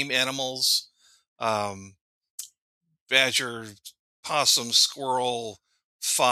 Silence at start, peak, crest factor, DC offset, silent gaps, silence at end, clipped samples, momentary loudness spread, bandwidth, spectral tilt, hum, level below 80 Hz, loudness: 0 s; -2 dBFS; 24 dB; under 0.1%; 1.28-1.36 s, 2.01-2.21 s, 2.30-2.38 s, 2.58-2.81 s, 3.01-3.06 s, 3.99-4.23 s, 5.84-5.99 s; 0 s; under 0.1%; 20 LU; 15.5 kHz; -0.5 dB/octave; none; -74 dBFS; -23 LUFS